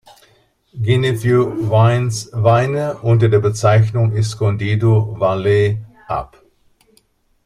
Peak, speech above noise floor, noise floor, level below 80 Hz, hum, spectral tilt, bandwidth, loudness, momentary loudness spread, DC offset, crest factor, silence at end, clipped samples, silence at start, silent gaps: -2 dBFS; 43 dB; -58 dBFS; -46 dBFS; none; -7 dB/octave; 11.5 kHz; -16 LUFS; 9 LU; under 0.1%; 14 dB; 1.2 s; under 0.1%; 0.75 s; none